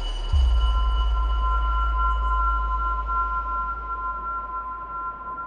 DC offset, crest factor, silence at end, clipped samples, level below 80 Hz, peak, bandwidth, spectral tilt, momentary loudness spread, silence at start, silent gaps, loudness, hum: under 0.1%; 12 dB; 0 s; under 0.1%; -24 dBFS; -12 dBFS; 6.8 kHz; -6 dB/octave; 8 LU; 0 s; none; -25 LUFS; none